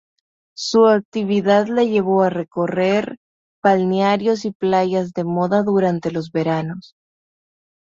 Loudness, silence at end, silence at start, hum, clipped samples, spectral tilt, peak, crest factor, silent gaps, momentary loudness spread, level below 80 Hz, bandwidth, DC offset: -18 LUFS; 1.05 s; 0.55 s; none; under 0.1%; -6.5 dB/octave; -2 dBFS; 16 dB; 1.05-1.12 s, 3.17-3.62 s, 4.55-4.60 s; 8 LU; -62 dBFS; 7.8 kHz; under 0.1%